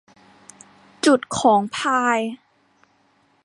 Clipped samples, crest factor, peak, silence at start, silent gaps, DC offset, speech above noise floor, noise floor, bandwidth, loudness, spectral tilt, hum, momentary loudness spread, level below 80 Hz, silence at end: under 0.1%; 20 dB; -4 dBFS; 1.05 s; none; under 0.1%; 42 dB; -61 dBFS; 11.5 kHz; -19 LUFS; -3.5 dB/octave; none; 9 LU; -62 dBFS; 1.1 s